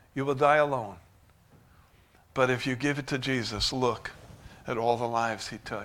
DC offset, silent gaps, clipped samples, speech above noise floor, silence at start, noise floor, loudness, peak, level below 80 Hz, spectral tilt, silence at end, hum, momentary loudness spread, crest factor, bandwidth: under 0.1%; none; under 0.1%; 32 dB; 0.15 s; -60 dBFS; -28 LUFS; -8 dBFS; -54 dBFS; -4.5 dB/octave; 0 s; none; 14 LU; 22 dB; 16.5 kHz